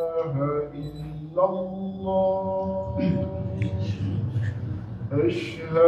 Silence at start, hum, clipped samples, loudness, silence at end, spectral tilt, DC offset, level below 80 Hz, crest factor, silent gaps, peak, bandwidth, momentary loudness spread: 0 s; none; under 0.1%; -27 LUFS; 0 s; -9 dB/octave; under 0.1%; -50 dBFS; 18 dB; none; -8 dBFS; 8.4 kHz; 9 LU